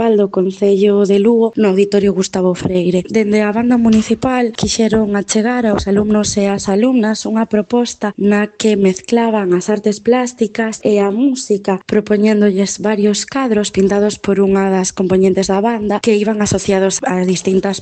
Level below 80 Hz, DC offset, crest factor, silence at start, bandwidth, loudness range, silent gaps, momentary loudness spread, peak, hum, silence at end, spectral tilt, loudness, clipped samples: -44 dBFS; under 0.1%; 12 dB; 0 s; 9 kHz; 2 LU; none; 4 LU; 0 dBFS; none; 0 s; -5.5 dB/octave; -14 LUFS; under 0.1%